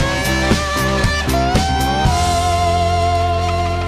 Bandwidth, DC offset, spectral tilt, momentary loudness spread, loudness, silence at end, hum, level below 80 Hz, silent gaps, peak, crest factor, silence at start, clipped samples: 15.5 kHz; under 0.1%; -4.5 dB/octave; 1 LU; -16 LUFS; 0 s; none; -24 dBFS; none; -4 dBFS; 10 dB; 0 s; under 0.1%